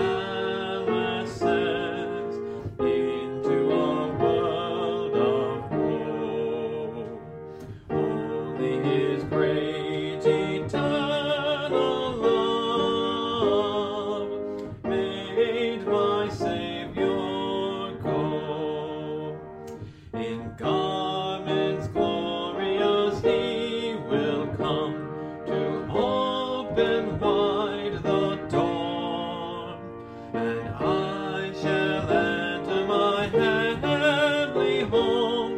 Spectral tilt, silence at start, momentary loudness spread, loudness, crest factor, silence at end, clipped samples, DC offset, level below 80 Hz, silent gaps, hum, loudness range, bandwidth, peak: -6.5 dB/octave; 0 s; 9 LU; -26 LUFS; 16 dB; 0 s; under 0.1%; under 0.1%; -54 dBFS; none; none; 5 LU; 9.8 kHz; -8 dBFS